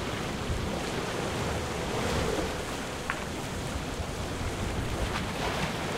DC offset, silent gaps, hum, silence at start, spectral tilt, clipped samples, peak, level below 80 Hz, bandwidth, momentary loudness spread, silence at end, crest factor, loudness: under 0.1%; none; none; 0 s; -4.5 dB/octave; under 0.1%; -10 dBFS; -40 dBFS; 16 kHz; 5 LU; 0 s; 22 dB; -32 LUFS